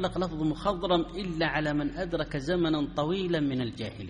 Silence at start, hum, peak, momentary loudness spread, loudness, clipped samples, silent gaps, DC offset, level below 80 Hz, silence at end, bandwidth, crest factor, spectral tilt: 0 s; none; -14 dBFS; 5 LU; -29 LUFS; under 0.1%; none; under 0.1%; -46 dBFS; 0 s; 10.5 kHz; 16 dB; -6.5 dB/octave